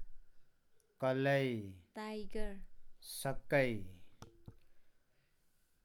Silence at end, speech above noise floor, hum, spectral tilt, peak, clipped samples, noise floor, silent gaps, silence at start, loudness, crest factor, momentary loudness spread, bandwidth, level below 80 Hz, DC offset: 0.95 s; 37 dB; none; -5.5 dB/octave; -20 dBFS; under 0.1%; -74 dBFS; none; 0 s; -38 LUFS; 20 dB; 23 LU; 18.5 kHz; -54 dBFS; under 0.1%